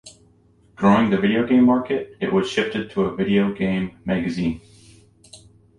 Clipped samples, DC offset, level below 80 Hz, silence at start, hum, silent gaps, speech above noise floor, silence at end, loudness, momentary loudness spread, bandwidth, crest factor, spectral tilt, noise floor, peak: under 0.1%; under 0.1%; -50 dBFS; 0.05 s; none; none; 36 dB; 0.45 s; -20 LUFS; 9 LU; 10.5 kHz; 18 dB; -7 dB/octave; -56 dBFS; -4 dBFS